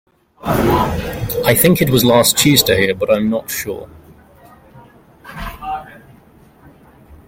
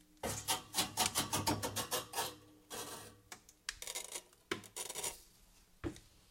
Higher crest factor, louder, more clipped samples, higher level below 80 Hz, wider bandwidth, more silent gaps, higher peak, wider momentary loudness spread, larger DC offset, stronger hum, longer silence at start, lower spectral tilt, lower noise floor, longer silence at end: second, 18 dB vs 28 dB; first, -14 LUFS vs -40 LUFS; neither; first, -38 dBFS vs -62 dBFS; about the same, 17 kHz vs 17 kHz; neither; first, 0 dBFS vs -14 dBFS; about the same, 17 LU vs 18 LU; neither; neither; first, 0.45 s vs 0.25 s; first, -4 dB/octave vs -2 dB/octave; second, -46 dBFS vs -65 dBFS; about the same, 0.1 s vs 0.2 s